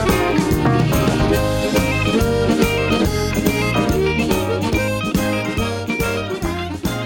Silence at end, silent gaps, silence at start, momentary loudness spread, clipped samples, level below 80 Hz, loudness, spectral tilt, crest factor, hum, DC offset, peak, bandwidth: 0 s; none; 0 s; 5 LU; under 0.1%; -30 dBFS; -18 LUFS; -5.5 dB/octave; 16 dB; none; under 0.1%; -2 dBFS; over 20 kHz